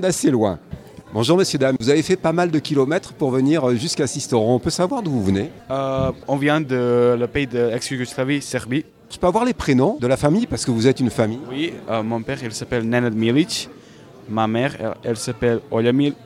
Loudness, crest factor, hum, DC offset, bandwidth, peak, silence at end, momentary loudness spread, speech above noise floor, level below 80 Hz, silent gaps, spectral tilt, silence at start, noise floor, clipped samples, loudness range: -20 LUFS; 18 dB; none; under 0.1%; 15.5 kHz; -2 dBFS; 0 s; 8 LU; 24 dB; -46 dBFS; none; -5.5 dB/octave; 0 s; -43 dBFS; under 0.1%; 3 LU